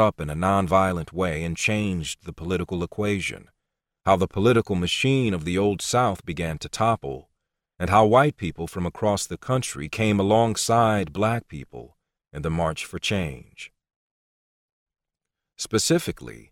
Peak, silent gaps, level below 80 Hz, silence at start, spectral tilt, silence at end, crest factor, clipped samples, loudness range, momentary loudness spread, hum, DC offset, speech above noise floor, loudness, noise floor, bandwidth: -4 dBFS; 13.96-14.86 s; -46 dBFS; 0 s; -5 dB/octave; 0.15 s; 20 dB; under 0.1%; 8 LU; 14 LU; none; under 0.1%; 63 dB; -23 LUFS; -86 dBFS; 16.5 kHz